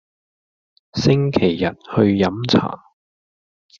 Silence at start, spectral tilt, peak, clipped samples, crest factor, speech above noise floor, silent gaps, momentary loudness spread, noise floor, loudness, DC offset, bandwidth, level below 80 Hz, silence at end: 0.95 s; -6 dB/octave; -2 dBFS; under 0.1%; 18 dB; over 73 dB; none; 12 LU; under -90 dBFS; -18 LUFS; under 0.1%; 7.4 kHz; -52 dBFS; 1.05 s